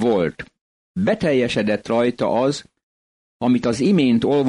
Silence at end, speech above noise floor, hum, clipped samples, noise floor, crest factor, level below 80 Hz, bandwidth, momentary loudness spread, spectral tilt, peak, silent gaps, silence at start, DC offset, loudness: 0 s; over 72 dB; none; under 0.1%; under -90 dBFS; 12 dB; -52 dBFS; 11 kHz; 12 LU; -6.5 dB/octave; -8 dBFS; 0.61-0.94 s, 2.83-3.40 s; 0 s; under 0.1%; -19 LUFS